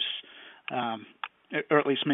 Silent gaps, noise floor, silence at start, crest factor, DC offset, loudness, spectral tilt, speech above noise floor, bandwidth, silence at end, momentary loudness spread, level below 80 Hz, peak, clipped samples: none; -49 dBFS; 0 s; 20 dB; under 0.1%; -30 LUFS; -9 dB/octave; 21 dB; 4 kHz; 0 s; 17 LU; -80 dBFS; -10 dBFS; under 0.1%